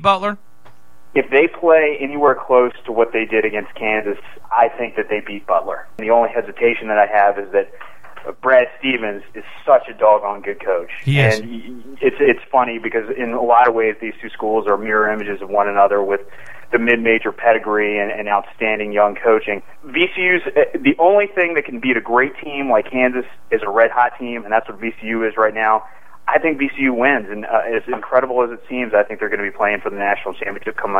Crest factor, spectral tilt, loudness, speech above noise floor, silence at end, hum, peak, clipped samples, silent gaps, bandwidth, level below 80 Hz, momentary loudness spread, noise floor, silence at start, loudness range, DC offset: 16 dB; -6.5 dB/octave; -17 LUFS; 32 dB; 0 s; none; 0 dBFS; under 0.1%; none; 12 kHz; -58 dBFS; 11 LU; -49 dBFS; 0 s; 2 LU; 2%